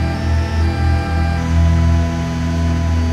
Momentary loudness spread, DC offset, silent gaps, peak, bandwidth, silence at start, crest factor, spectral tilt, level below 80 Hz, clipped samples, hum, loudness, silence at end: 4 LU; under 0.1%; none; -4 dBFS; 8.8 kHz; 0 s; 12 dB; -7 dB/octave; -20 dBFS; under 0.1%; none; -17 LUFS; 0 s